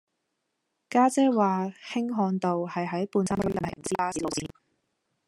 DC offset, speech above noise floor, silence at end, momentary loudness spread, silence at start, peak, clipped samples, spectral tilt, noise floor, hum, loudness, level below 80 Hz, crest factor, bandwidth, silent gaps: under 0.1%; 53 dB; 0.8 s; 9 LU; 0.9 s; -8 dBFS; under 0.1%; -5.5 dB/octave; -80 dBFS; none; -27 LUFS; -60 dBFS; 20 dB; 12.5 kHz; none